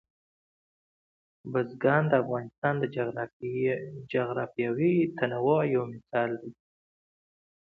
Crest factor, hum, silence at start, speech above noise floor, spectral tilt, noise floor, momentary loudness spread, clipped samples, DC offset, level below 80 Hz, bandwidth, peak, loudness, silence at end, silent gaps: 20 dB; none; 1.45 s; over 62 dB; -10 dB/octave; under -90 dBFS; 9 LU; under 0.1%; under 0.1%; -70 dBFS; 4.7 kHz; -10 dBFS; -29 LUFS; 1.2 s; 2.58-2.62 s, 3.33-3.40 s